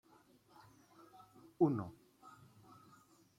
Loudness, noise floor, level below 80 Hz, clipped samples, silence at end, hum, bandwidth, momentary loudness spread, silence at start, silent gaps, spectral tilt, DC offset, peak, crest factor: -37 LUFS; -68 dBFS; -80 dBFS; under 0.1%; 1.1 s; none; 14.5 kHz; 28 LU; 1.6 s; none; -9.5 dB/octave; under 0.1%; -20 dBFS; 24 dB